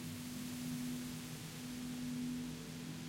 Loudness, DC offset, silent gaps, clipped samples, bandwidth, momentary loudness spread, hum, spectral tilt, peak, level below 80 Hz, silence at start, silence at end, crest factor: -44 LUFS; under 0.1%; none; under 0.1%; 16.5 kHz; 5 LU; none; -4.5 dB/octave; -32 dBFS; -66 dBFS; 0 s; 0 s; 12 dB